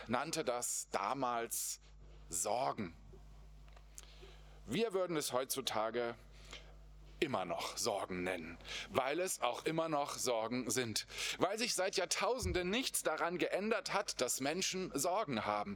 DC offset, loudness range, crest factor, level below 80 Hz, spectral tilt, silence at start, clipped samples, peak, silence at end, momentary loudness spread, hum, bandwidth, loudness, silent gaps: under 0.1%; 5 LU; 24 dB; -60 dBFS; -3 dB/octave; 0 s; under 0.1%; -14 dBFS; 0 s; 12 LU; none; over 20 kHz; -38 LUFS; none